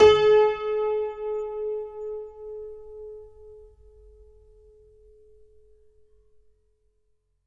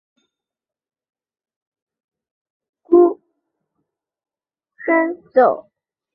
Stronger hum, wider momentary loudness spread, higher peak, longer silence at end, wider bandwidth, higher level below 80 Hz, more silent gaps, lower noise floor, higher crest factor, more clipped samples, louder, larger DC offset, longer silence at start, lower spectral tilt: neither; first, 23 LU vs 15 LU; second, -6 dBFS vs -2 dBFS; first, 3.9 s vs 0.55 s; first, 7.4 kHz vs 4.1 kHz; first, -56 dBFS vs -70 dBFS; neither; second, -69 dBFS vs -89 dBFS; about the same, 22 dB vs 20 dB; neither; second, -24 LUFS vs -16 LUFS; neither; second, 0 s vs 2.9 s; second, -4 dB/octave vs -9.5 dB/octave